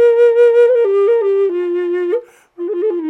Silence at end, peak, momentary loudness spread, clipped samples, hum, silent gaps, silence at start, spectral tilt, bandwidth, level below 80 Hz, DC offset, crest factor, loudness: 0 s; -4 dBFS; 11 LU; under 0.1%; none; none; 0 s; -4.5 dB/octave; 4.1 kHz; -78 dBFS; under 0.1%; 10 dB; -13 LUFS